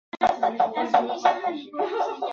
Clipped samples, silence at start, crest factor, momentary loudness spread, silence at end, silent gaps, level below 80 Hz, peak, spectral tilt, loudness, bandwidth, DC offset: under 0.1%; 0.15 s; 20 dB; 7 LU; 0 s; none; -66 dBFS; -4 dBFS; -4 dB/octave; -24 LUFS; 7.4 kHz; under 0.1%